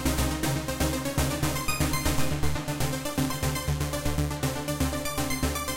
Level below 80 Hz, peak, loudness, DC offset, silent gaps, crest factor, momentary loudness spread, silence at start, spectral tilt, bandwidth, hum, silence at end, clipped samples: -36 dBFS; -12 dBFS; -28 LUFS; under 0.1%; none; 14 dB; 3 LU; 0 s; -4.5 dB/octave; 17 kHz; none; 0 s; under 0.1%